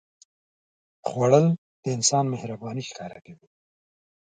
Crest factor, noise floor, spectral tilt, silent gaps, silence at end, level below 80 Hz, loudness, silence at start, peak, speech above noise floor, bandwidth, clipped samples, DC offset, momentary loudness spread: 22 dB; under -90 dBFS; -5 dB/octave; 1.58-1.83 s; 0.9 s; -68 dBFS; -24 LUFS; 1.05 s; -4 dBFS; over 66 dB; 9.6 kHz; under 0.1%; under 0.1%; 17 LU